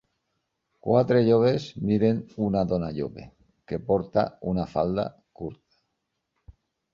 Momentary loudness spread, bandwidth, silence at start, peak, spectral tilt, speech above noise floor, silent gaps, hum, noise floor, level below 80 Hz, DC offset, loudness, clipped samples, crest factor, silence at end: 17 LU; 7.2 kHz; 0.85 s; -8 dBFS; -8.5 dB/octave; 55 dB; none; none; -79 dBFS; -52 dBFS; under 0.1%; -25 LUFS; under 0.1%; 18 dB; 1.4 s